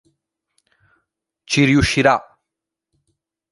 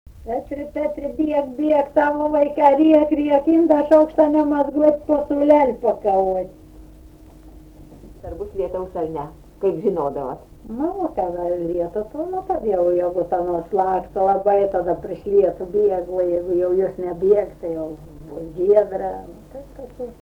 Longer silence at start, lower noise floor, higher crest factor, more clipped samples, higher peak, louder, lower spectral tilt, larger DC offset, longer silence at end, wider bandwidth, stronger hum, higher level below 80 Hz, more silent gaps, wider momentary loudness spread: first, 1.5 s vs 0.15 s; first, -83 dBFS vs -44 dBFS; about the same, 20 dB vs 16 dB; neither; about the same, -2 dBFS vs -2 dBFS; first, -16 LUFS vs -19 LUFS; second, -5 dB/octave vs -8.5 dB/octave; neither; first, 1.3 s vs 0.1 s; first, 11.5 kHz vs 6.4 kHz; neither; first, -40 dBFS vs -46 dBFS; neither; second, 7 LU vs 17 LU